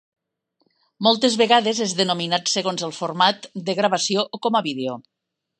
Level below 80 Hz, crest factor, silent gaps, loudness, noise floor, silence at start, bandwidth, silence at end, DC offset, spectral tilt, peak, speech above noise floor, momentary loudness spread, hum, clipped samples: -74 dBFS; 20 dB; none; -20 LUFS; -70 dBFS; 1 s; 10 kHz; 0.6 s; under 0.1%; -3 dB/octave; -2 dBFS; 49 dB; 10 LU; none; under 0.1%